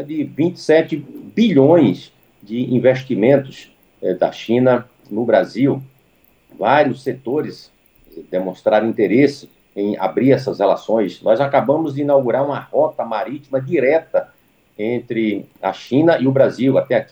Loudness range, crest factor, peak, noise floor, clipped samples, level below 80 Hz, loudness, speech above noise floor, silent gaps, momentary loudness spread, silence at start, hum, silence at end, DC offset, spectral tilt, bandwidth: 3 LU; 18 dB; 0 dBFS; -56 dBFS; under 0.1%; -64 dBFS; -17 LUFS; 40 dB; none; 10 LU; 0 s; none; 0.05 s; under 0.1%; -7.5 dB/octave; 15 kHz